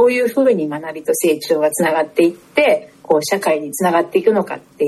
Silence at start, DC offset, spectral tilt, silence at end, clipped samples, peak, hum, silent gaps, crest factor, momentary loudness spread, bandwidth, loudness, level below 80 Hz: 0 s; under 0.1%; -4.5 dB/octave; 0 s; under 0.1%; -2 dBFS; none; none; 14 dB; 5 LU; 13 kHz; -16 LUFS; -62 dBFS